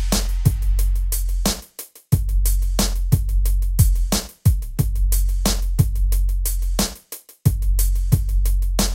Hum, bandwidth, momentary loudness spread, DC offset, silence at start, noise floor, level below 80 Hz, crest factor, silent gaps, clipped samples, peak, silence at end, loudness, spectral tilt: none; 17 kHz; 4 LU; under 0.1%; 0 s; -40 dBFS; -20 dBFS; 16 dB; none; under 0.1%; -2 dBFS; 0 s; -21 LUFS; -4.5 dB/octave